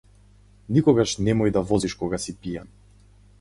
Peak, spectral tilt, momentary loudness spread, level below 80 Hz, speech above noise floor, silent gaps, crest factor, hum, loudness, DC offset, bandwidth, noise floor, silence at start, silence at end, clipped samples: -6 dBFS; -6 dB/octave; 14 LU; -46 dBFS; 31 dB; none; 18 dB; 50 Hz at -40 dBFS; -23 LUFS; under 0.1%; 11.5 kHz; -53 dBFS; 0.7 s; 0.75 s; under 0.1%